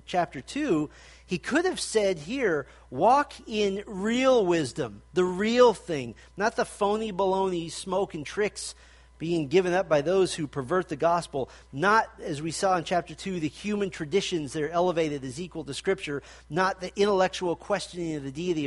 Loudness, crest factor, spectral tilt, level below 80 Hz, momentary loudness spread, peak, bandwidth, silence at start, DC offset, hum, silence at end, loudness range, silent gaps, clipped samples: -27 LUFS; 20 dB; -5 dB/octave; -54 dBFS; 11 LU; -6 dBFS; 11.5 kHz; 0.1 s; under 0.1%; none; 0 s; 4 LU; none; under 0.1%